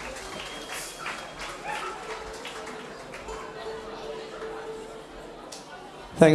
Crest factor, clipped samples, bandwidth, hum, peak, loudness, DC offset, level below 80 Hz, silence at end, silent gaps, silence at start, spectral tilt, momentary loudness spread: 28 dB; under 0.1%; 13 kHz; none; -4 dBFS; -35 LUFS; under 0.1%; -54 dBFS; 0 s; none; 0 s; -5 dB/octave; 8 LU